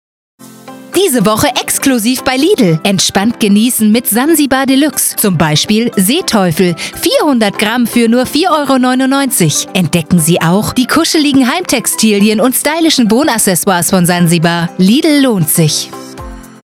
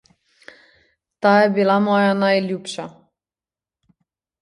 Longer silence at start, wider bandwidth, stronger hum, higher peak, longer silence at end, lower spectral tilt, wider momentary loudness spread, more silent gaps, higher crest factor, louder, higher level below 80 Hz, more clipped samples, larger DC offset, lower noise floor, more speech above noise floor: second, 0.4 s vs 1.2 s; first, 19 kHz vs 11 kHz; neither; about the same, 0 dBFS vs -2 dBFS; second, 0.2 s vs 1.5 s; second, -4 dB/octave vs -6 dB/octave; second, 3 LU vs 16 LU; neither; second, 10 dB vs 18 dB; first, -10 LUFS vs -17 LUFS; first, -42 dBFS vs -70 dBFS; neither; neither; second, -31 dBFS vs under -90 dBFS; second, 22 dB vs over 73 dB